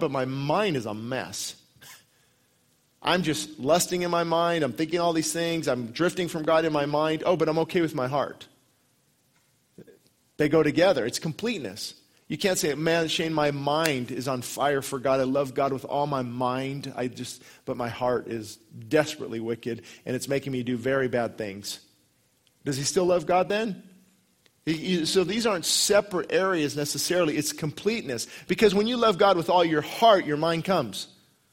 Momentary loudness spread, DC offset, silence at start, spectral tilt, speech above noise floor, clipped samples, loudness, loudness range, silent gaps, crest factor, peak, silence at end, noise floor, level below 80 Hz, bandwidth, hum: 12 LU; under 0.1%; 0 s; -4 dB/octave; 41 dB; under 0.1%; -26 LUFS; 6 LU; none; 20 dB; -6 dBFS; 0.45 s; -67 dBFS; -62 dBFS; 16 kHz; none